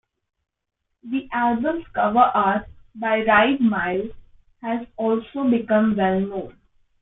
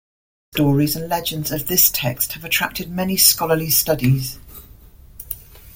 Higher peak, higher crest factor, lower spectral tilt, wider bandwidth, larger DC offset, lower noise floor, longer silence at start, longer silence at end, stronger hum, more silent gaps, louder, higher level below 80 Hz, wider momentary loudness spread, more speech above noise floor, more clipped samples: about the same, -2 dBFS vs 0 dBFS; about the same, 20 dB vs 20 dB; first, -10 dB/octave vs -3.5 dB/octave; second, 4 kHz vs 17 kHz; neither; first, -78 dBFS vs -44 dBFS; first, 1.05 s vs 0.55 s; first, 0.5 s vs 0.05 s; neither; neither; second, -21 LUFS vs -17 LUFS; second, -52 dBFS vs -44 dBFS; second, 12 LU vs 17 LU; first, 57 dB vs 25 dB; neither